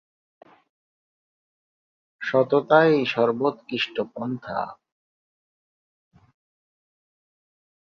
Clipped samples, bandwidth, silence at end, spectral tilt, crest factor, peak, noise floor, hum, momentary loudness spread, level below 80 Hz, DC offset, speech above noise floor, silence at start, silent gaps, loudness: under 0.1%; 7 kHz; 3.2 s; -7 dB/octave; 24 dB; -4 dBFS; under -90 dBFS; none; 14 LU; -70 dBFS; under 0.1%; over 68 dB; 2.2 s; none; -23 LUFS